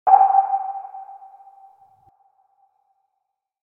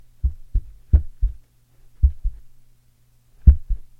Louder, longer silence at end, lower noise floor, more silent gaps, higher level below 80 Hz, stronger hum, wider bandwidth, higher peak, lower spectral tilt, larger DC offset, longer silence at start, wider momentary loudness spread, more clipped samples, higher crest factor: first, -18 LUFS vs -23 LUFS; first, 2.5 s vs 0.15 s; first, -78 dBFS vs -56 dBFS; neither; second, -80 dBFS vs -22 dBFS; neither; first, 2.7 kHz vs 0.9 kHz; about the same, 0 dBFS vs 0 dBFS; second, -5.5 dB/octave vs -11 dB/octave; neither; second, 0.05 s vs 0.25 s; first, 27 LU vs 13 LU; neither; about the same, 22 dB vs 20 dB